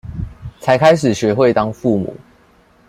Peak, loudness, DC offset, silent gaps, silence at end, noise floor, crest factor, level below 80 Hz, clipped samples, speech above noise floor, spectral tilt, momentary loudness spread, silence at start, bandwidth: -2 dBFS; -15 LUFS; under 0.1%; none; 0.75 s; -51 dBFS; 14 dB; -42 dBFS; under 0.1%; 37 dB; -6 dB/octave; 17 LU; 0.05 s; 14 kHz